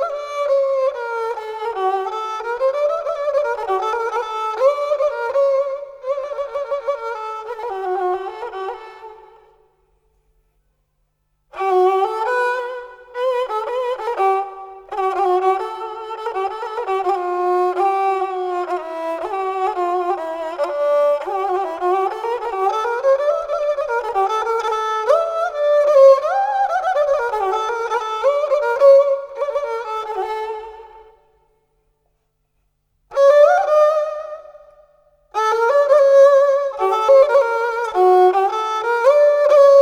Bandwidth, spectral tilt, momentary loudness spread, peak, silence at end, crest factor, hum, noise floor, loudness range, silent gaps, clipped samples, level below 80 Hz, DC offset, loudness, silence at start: 10 kHz; -3 dB/octave; 14 LU; 0 dBFS; 0 s; 18 dB; none; -67 dBFS; 11 LU; none; under 0.1%; -60 dBFS; under 0.1%; -18 LUFS; 0 s